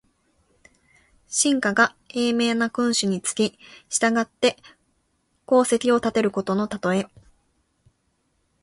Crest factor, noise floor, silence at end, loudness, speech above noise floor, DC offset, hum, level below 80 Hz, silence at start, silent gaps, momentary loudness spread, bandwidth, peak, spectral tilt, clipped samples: 20 dB; -70 dBFS; 1.55 s; -22 LUFS; 48 dB; under 0.1%; none; -62 dBFS; 1.3 s; none; 6 LU; 11.5 kHz; -4 dBFS; -3.5 dB/octave; under 0.1%